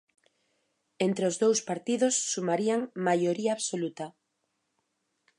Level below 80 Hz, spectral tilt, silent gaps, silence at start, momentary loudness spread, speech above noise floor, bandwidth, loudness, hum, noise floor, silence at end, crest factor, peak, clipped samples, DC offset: -82 dBFS; -4 dB/octave; none; 1 s; 7 LU; 51 dB; 11.5 kHz; -28 LUFS; none; -79 dBFS; 1.3 s; 18 dB; -14 dBFS; under 0.1%; under 0.1%